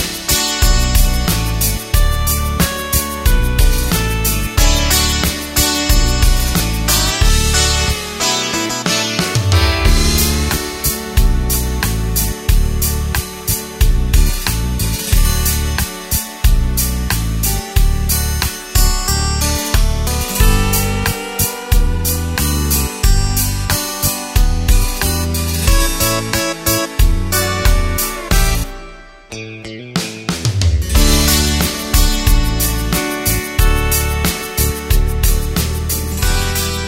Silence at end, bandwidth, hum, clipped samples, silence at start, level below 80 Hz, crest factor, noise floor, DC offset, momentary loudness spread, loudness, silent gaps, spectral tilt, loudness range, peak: 0 s; 16.5 kHz; none; under 0.1%; 0 s; -16 dBFS; 14 dB; -35 dBFS; under 0.1%; 5 LU; -15 LUFS; none; -3.5 dB/octave; 3 LU; 0 dBFS